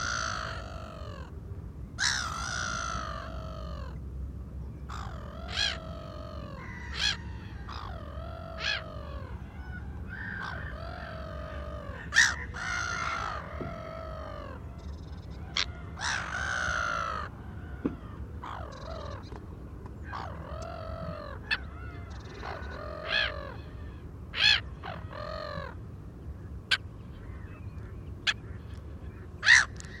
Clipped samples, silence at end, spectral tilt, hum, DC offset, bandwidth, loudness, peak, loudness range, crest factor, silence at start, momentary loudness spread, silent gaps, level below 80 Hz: under 0.1%; 0 s; -2.5 dB/octave; none; under 0.1%; 15 kHz; -32 LUFS; -8 dBFS; 8 LU; 26 dB; 0 s; 15 LU; none; -44 dBFS